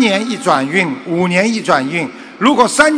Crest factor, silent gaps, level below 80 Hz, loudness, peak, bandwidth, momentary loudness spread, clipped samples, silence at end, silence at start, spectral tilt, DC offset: 14 dB; none; -54 dBFS; -14 LUFS; 0 dBFS; 11 kHz; 7 LU; 0.5%; 0 s; 0 s; -4 dB/octave; under 0.1%